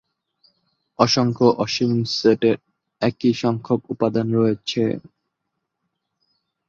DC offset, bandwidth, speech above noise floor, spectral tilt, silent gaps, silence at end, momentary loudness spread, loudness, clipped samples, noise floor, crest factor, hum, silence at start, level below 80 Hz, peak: under 0.1%; 7.6 kHz; 59 dB; -6 dB/octave; none; 1.7 s; 7 LU; -20 LUFS; under 0.1%; -78 dBFS; 22 dB; none; 1 s; -60 dBFS; 0 dBFS